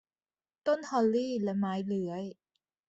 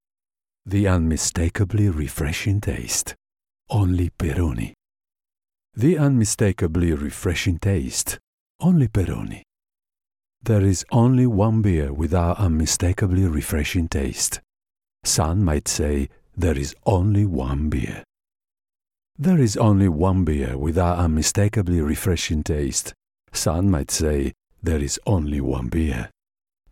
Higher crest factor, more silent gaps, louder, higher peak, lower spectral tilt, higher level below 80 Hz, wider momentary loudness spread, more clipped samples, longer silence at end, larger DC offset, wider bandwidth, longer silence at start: about the same, 18 dB vs 16 dB; second, none vs 8.27-8.59 s; second, -32 LUFS vs -21 LUFS; second, -16 dBFS vs -6 dBFS; first, -7 dB/octave vs -5.5 dB/octave; second, -76 dBFS vs -34 dBFS; about the same, 9 LU vs 8 LU; neither; about the same, 0.55 s vs 0.65 s; neither; second, 8 kHz vs 16.5 kHz; about the same, 0.65 s vs 0.65 s